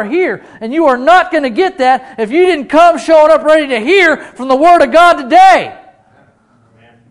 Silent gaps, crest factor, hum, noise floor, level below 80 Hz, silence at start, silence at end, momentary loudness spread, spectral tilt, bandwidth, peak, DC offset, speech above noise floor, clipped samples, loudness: none; 10 dB; none; -50 dBFS; -48 dBFS; 0 s; 1.35 s; 9 LU; -4 dB/octave; 12 kHz; 0 dBFS; under 0.1%; 41 dB; 3%; -9 LUFS